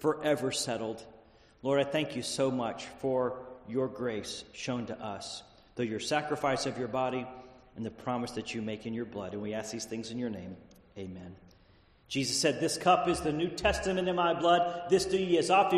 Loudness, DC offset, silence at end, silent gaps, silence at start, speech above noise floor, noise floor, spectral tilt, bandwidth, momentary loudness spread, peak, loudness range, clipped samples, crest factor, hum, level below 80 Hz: -32 LUFS; under 0.1%; 0 s; none; 0 s; 31 dB; -62 dBFS; -4 dB/octave; 13 kHz; 17 LU; -12 dBFS; 9 LU; under 0.1%; 20 dB; none; -56 dBFS